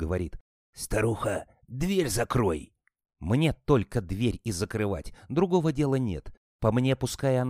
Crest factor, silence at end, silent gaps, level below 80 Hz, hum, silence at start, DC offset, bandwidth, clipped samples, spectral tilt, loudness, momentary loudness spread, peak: 18 dB; 0 s; 0.41-0.73 s, 6.37-6.59 s; -44 dBFS; none; 0 s; under 0.1%; 15.5 kHz; under 0.1%; -6 dB/octave; -28 LUFS; 11 LU; -8 dBFS